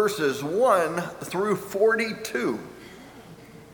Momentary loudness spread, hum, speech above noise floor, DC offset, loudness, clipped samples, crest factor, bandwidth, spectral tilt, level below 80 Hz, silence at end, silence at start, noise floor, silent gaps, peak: 23 LU; none; 22 dB; under 0.1%; -25 LUFS; under 0.1%; 18 dB; over 20 kHz; -4.5 dB/octave; -64 dBFS; 0 s; 0 s; -46 dBFS; none; -6 dBFS